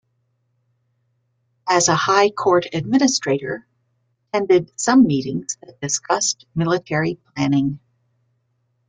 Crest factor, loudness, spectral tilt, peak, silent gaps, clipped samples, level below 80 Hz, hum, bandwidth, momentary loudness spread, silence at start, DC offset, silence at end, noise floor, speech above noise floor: 20 dB; -19 LUFS; -4 dB/octave; -2 dBFS; none; under 0.1%; -58 dBFS; none; 9.6 kHz; 12 LU; 1.65 s; under 0.1%; 1.1 s; -69 dBFS; 50 dB